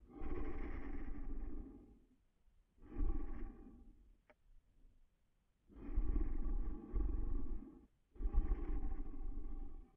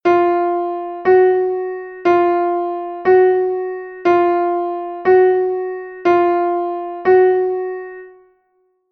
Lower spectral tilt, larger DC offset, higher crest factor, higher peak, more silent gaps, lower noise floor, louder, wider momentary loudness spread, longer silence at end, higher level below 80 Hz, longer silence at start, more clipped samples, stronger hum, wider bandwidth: first, -9.5 dB/octave vs -7.5 dB/octave; neither; about the same, 18 dB vs 14 dB; second, -24 dBFS vs -2 dBFS; neither; first, -78 dBFS vs -63 dBFS; second, -48 LUFS vs -16 LUFS; first, 16 LU vs 11 LU; second, 0.1 s vs 0.8 s; first, -42 dBFS vs -60 dBFS; about the same, 0 s vs 0.05 s; neither; neither; second, 2.6 kHz vs 5 kHz